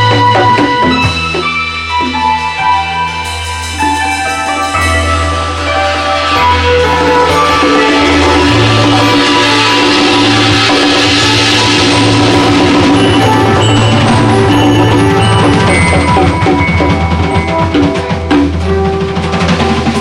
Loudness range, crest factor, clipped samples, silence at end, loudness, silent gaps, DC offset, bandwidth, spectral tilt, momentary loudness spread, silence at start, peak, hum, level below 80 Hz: 5 LU; 8 dB; under 0.1%; 0 s; -8 LUFS; none; under 0.1%; 14 kHz; -5 dB/octave; 6 LU; 0 s; 0 dBFS; none; -26 dBFS